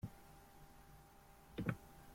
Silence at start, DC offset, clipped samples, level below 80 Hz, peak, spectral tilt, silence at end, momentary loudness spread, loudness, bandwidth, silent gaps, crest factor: 0 s; under 0.1%; under 0.1%; -64 dBFS; -24 dBFS; -7 dB/octave; 0 s; 18 LU; -48 LUFS; 16.5 kHz; none; 26 dB